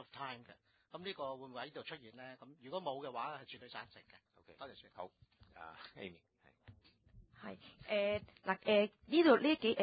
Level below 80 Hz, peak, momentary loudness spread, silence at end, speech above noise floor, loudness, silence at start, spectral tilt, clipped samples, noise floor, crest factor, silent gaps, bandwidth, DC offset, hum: -72 dBFS; -16 dBFS; 22 LU; 0 s; 25 dB; -37 LUFS; 0 s; -2.5 dB/octave; under 0.1%; -64 dBFS; 24 dB; none; 4.9 kHz; under 0.1%; none